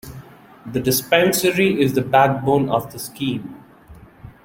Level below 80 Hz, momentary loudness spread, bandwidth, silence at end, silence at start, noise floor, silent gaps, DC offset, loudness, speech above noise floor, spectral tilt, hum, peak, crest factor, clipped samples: -50 dBFS; 15 LU; 17 kHz; 0.15 s; 0.05 s; -44 dBFS; none; under 0.1%; -18 LUFS; 26 dB; -4.5 dB/octave; none; -2 dBFS; 18 dB; under 0.1%